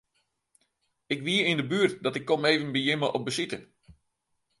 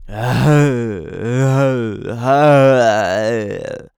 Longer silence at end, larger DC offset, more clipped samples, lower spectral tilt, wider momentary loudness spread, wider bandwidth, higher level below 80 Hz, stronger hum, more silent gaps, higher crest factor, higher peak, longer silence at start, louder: first, 0.7 s vs 0.1 s; neither; neither; second, -4.5 dB/octave vs -7 dB/octave; second, 8 LU vs 13 LU; second, 11.5 kHz vs 16 kHz; second, -68 dBFS vs -42 dBFS; neither; neither; first, 22 dB vs 12 dB; second, -8 dBFS vs -2 dBFS; first, 1.1 s vs 0 s; second, -27 LUFS vs -15 LUFS